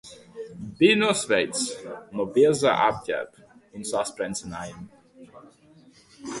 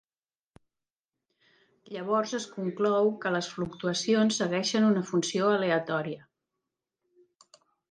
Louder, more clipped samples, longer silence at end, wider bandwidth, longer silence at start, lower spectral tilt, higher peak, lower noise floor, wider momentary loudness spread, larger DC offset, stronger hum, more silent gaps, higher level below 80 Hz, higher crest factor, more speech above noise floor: first, -23 LUFS vs -28 LUFS; neither; second, 0 s vs 1.7 s; first, 11.5 kHz vs 10 kHz; second, 0.05 s vs 1.9 s; about the same, -3.5 dB/octave vs -4.5 dB/octave; first, -6 dBFS vs -14 dBFS; second, -55 dBFS vs under -90 dBFS; first, 21 LU vs 10 LU; neither; neither; neither; first, -60 dBFS vs -72 dBFS; about the same, 20 dB vs 16 dB; second, 30 dB vs over 63 dB